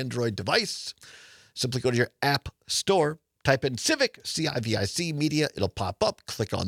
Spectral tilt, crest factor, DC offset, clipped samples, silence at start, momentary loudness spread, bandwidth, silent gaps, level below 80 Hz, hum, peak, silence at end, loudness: -4 dB/octave; 22 dB; under 0.1%; under 0.1%; 0 s; 7 LU; 17 kHz; none; -56 dBFS; none; -4 dBFS; 0 s; -27 LUFS